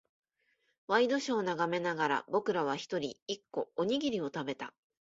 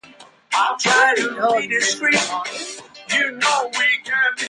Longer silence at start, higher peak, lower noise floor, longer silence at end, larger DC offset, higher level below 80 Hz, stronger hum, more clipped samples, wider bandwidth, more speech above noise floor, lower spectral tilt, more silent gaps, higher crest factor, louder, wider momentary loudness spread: first, 0.9 s vs 0.2 s; second, -14 dBFS vs -4 dBFS; first, -77 dBFS vs -46 dBFS; first, 0.4 s vs 0 s; neither; second, -76 dBFS vs -70 dBFS; neither; neither; second, 7.8 kHz vs 11.5 kHz; first, 44 dB vs 27 dB; first, -4.5 dB/octave vs -1 dB/octave; first, 3.22-3.26 s vs none; about the same, 20 dB vs 16 dB; second, -33 LUFS vs -18 LUFS; about the same, 9 LU vs 11 LU